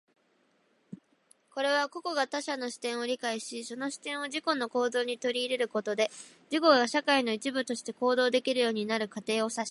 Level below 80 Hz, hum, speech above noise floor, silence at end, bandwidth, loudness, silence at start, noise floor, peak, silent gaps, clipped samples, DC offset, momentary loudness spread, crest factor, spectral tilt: -86 dBFS; none; 40 dB; 0 s; 11.5 kHz; -30 LUFS; 0.9 s; -70 dBFS; -8 dBFS; none; under 0.1%; under 0.1%; 9 LU; 22 dB; -2.5 dB/octave